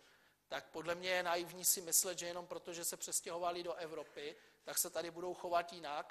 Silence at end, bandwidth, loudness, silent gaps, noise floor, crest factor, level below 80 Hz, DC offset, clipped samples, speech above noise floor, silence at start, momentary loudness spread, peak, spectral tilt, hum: 0 s; 14 kHz; -39 LUFS; none; -70 dBFS; 22 dB; -80 dBFS; under 0.1%; under 0.1%; 29 dB; 0.5 s; 14 LU; -18 dBFS; -1 dB/octave; none